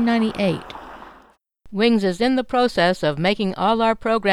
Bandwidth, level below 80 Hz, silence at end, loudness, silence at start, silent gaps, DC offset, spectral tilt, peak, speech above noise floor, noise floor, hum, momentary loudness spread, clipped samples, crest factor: 12 kHz; -48 dBFS; 0 s; -20 LUFS; 0 s; none; under 0.1%; -6 dB/octave; -4 dBFS; 34 dB; -53 dBFS; none; 13 LU; under 0.1%; 16 dB